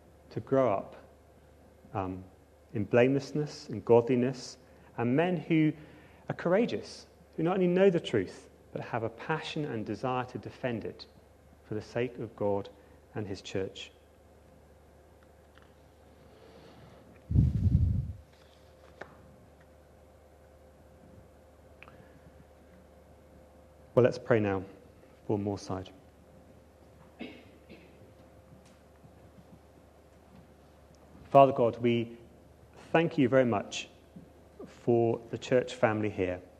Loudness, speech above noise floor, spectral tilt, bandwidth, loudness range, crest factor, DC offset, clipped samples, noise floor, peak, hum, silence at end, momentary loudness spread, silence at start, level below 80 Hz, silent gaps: -30 LUFS; 29 dB; -7 dB/octave; 12.5 kHz; 14 LU; 26 dB; under 0.1%; under 0.1%; -58 dBFS; -6 dBFS; none; 0.15 s; 22 LU; 0.3 s; -50 dBFS; none